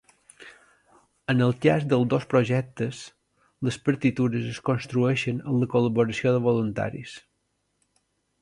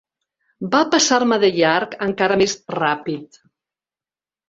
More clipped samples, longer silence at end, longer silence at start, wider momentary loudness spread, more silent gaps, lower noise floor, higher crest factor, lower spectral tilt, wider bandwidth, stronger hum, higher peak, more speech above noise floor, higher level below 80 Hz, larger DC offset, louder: neither; about the same, 1.2 s vs 1.25 s; second, 0.4 s vs 0.6 s; about the same, 10 LU vs 11 LU; neither; second, -74 dBFS vs under -90 dBFS; about the same, 20 dB vs 18 dB; first, -7 dB/octave vs -3 dB/octave; first, 11 kHz vs 8 kHz; first, 50 Hz at -60 dBFS vs none; second, -6 dBFS vs -2 dBFS; second, 50 dB vs over 72 dB; about the same, -60 dBFS vs -58 dBFS; neither; second, -25 LUFS vs -18 LUFS